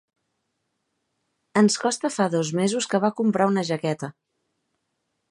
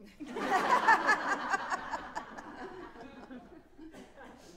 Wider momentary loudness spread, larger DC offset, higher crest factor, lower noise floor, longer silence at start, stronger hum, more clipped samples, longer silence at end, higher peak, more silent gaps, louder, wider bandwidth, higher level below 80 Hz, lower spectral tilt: second, 7 LU vs 26 LU; neither; about the same, 20 dB vs 22 dB; first, -77 dBFS vs -53 dBFS; first, 1.55 s vs 0 s; neither; neither; first, 1.2 s vs 0 s; first, -6 dBFS vs -12 dBFS; neither; first, -23 LUFS vs -30 LUFS; second, 11.5 kHz vs 16 kHz; second, -74 dBFS vs -64 dBFS; first, -5 dB/octave vs -3 dB/octave